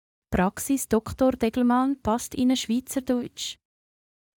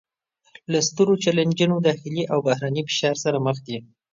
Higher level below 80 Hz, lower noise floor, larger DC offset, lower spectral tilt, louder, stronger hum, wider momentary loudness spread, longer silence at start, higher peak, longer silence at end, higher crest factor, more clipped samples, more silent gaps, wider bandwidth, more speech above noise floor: first, -48 dBFS vs -66 dBFS; first, under -90 dBFS vs -66 dBFS; neither; about the same, -4.5 dB/octave vs -5 dB/octave; second, -25 LUFS vs -22 LUFS; neither; about the same, 9 LU vs 9 LU; second, 0.3 s vs 0.7 s; second, -10 dBFS vs -6 dBFS; first, 0.85 s vs 0.3 s; about the same, 16 dB vs 16 dB; neither; neither; first, 19 kHz vs 7.6 kHz; first, over 66 dB vs 44 dB